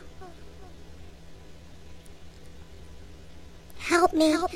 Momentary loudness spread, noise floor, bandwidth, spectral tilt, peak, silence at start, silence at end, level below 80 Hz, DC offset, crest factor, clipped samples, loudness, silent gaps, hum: 28 LU; -48 dBFS; 15.5 kHz; -4 dB/octave; -8 dBFS; 0.05 s; 0 s; -50 dBFS; 0.5%; 24 dB; under 0.1%; -24 LUFS; none; none